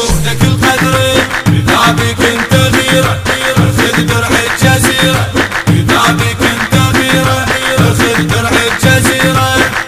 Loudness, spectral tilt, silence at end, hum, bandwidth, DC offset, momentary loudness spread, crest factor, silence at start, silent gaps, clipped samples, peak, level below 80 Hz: -9 LUFS; -4.5 dB/octave; 0 s; none; 16.5 kHz; under 0.1%; 3 LU; 10 dB; 0 s; none; 0.3%; 0 dBFS; -28 dBFS